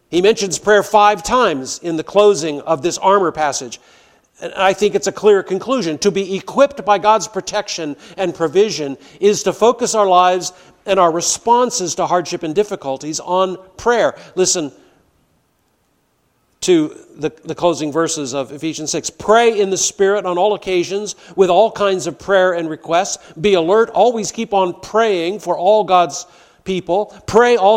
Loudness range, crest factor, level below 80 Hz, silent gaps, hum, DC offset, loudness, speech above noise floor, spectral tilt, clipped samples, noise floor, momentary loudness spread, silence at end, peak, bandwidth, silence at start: 5 LU; 16 dB; -52 dBFS; none; none; under 0.1%; -16 LUFS; 47 dB; -3.5 dB/octave; under 0.1%; -62 dBFS; 11 LU; 0 s; 0 dBFS; 15.5 kHz; 0.1 s